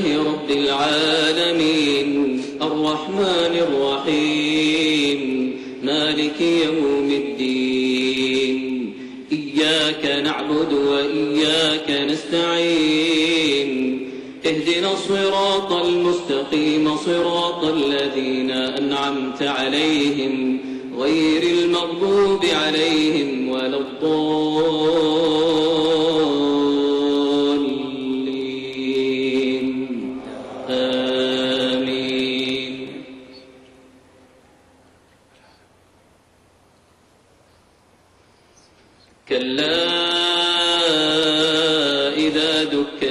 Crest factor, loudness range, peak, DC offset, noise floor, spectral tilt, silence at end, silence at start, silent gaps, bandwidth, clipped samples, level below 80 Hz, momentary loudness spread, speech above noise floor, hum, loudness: 12 dB; 5 LU; -8 dBFS; under 0.1%; -55 dBFS; -4 dB/octave; 0 s; 0 s; none; 12 kHz; under 0.1%; -56 dBFS; 7 LU; 37 dB; none; -19 LUFS